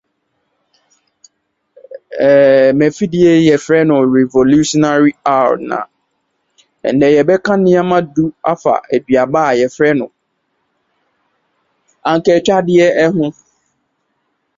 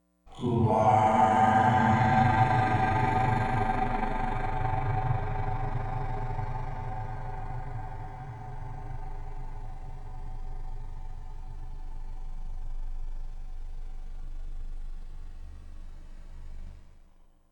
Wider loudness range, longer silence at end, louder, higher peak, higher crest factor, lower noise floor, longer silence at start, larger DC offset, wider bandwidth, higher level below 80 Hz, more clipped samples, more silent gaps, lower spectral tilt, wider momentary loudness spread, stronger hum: second, 5 LU vs 22 LU; first, 1.25 s vs 0.5 s; first, -12 LUFS vs -27 LUFS; first, 0 dBFS vs -10 dBFS; about the same, 14 dB vs 18 dB; first, -67 dBFS vs -56 dBFS; first, 1.9 s vs 0.25 s; neither; second, 7.8 kHz vs 9.2 kHz; second, -52 dBFS vs -36 dBFS; neither; neither; second, -6 dB/octave vs -7.5 dB/octave; second, 9 LU vs 24 LU; neither